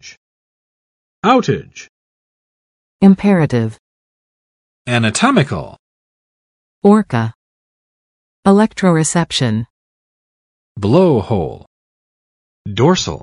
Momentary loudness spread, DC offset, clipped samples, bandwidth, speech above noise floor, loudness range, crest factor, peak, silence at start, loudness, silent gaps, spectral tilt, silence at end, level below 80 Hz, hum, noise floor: 14 LU; under 0.1%; under 0.1%; 11.5 kHz; over 77 dB; 4 LU; 16 dB; 0 dBFS; 0.05 s; -14 LUFS; 0.17-1.23 s, 1.89-2.99 s, 3.79-4.85 s, 5.79-6.82 s, 7.35-8.43 s, 9.70-10.75 s, 11.67-12.65 s; -5.5 dB/octave; 0.05 s; -48 dBFS; none; under -90 dBFS